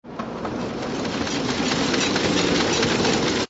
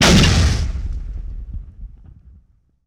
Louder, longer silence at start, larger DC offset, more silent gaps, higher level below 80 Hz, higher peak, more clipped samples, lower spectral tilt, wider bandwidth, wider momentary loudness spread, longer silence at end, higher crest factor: second, -22 LUFS vs -17 LUFS; about the same, 0.05 s vs 0 s; neither; neither; second, -46 dBFS vs -24 dBFS; about the same, -8 dBFS vs -6 dBFS; neither; about the same, -3.5 dB/octave vs -4.5 dB/octave; second, 8 kHz vs 16.5 kHz; second, 9 LU vs 23 LU; second, 0 s vs 1 s; about the same, 16 dB vs 12 dB